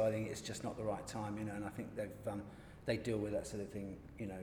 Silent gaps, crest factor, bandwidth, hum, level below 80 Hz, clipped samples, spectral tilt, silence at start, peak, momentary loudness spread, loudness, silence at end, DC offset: none; 20 dB; over 20 kHz; none; -62 dBFS; under 0.1%; -5.5 dB/octave; 0 s; -22 dBFS; 9 LU; -43 LUFS; 0 s; under 0.1%